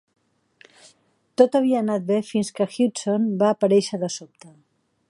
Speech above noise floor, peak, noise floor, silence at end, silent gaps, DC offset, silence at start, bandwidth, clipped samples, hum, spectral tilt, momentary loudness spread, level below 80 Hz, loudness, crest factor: 39 dB; -2 dBFS; -60 dBFS; 0.6 s; none; under 0.1%; 1.4 s; 11.5 kHz; under 0.1%; none; -5.5 dB/octave; 10 LU; -72 dBFS; -21 LUFS; 20 dB